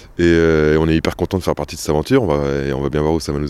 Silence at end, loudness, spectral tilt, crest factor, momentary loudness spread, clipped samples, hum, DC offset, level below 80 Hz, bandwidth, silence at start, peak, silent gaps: 0 s; -17 LUFS; -6.5 dB/octave; 14 dB; 7 LU; under 0.1%; none; under 0.1%; -34 dBFS; 14 kHz; 0 s; -2 dBFS; none